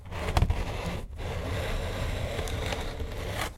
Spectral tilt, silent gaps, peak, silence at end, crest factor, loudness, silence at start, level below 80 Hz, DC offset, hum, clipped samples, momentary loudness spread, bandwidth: -5 dB/octave; none; -10 dBFS; 0 s; 22 dB; -33 LUFS; 0 s; -34 dBFS; under 0.1%; none; under 0.1%; 8 LU; 16.5 kHz